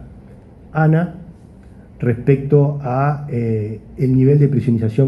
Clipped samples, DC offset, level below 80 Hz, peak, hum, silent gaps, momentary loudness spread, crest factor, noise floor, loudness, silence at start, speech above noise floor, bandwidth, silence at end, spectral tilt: under 0.1%; under 0.1%; -44 dBFS; 0 dBFS; none; none; 11 LU; 16 dB; -41 dBFS; -17 LUFS; 0 s; 25 dB; 5.2 kHz; 0 s; -11 dB/octave